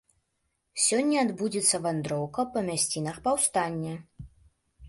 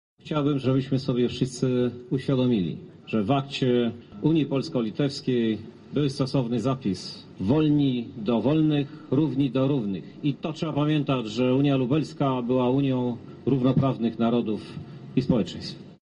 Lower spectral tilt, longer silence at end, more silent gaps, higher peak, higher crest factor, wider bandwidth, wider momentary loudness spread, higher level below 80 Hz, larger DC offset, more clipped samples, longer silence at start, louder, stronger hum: second, -3.5 dB/octave vs -7.5 dB/octave; about the same, 0 s vs 0.05 s; neither; about the same, -10 dBFS vs -10 dBFS; about the same, 18 dB vs 16 dB; first, 12 kHz vs 10.5 kHz; about the same, 9 LU vs 9 LU; about the same, -60 dBFS vs -56 dBFS; neither; neither; first, 0.75 s vs 0.25 s; about the same, -27 LUFS vs -25 LUFS; neither